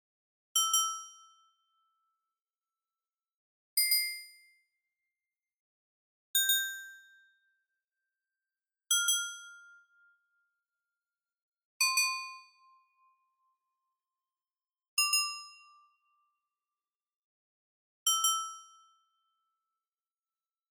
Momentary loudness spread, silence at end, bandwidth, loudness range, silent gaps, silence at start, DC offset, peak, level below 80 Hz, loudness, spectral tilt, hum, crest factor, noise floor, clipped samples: 19 LU; 2.1 s; 18 kHz; 2 LU; 3.36-3.77 s, 5.60-6.34 s, 11.42-11.52 s, 11.65-11.80 s, 14.88-14.97 s, 17.16-18.06 s; 0.55 s; under 0.1%; -14 dBFS; under -90 dBFS; -29 LUFS; 12 dB/octave; none; 24 dB; under -90 dBFS; under 0.1%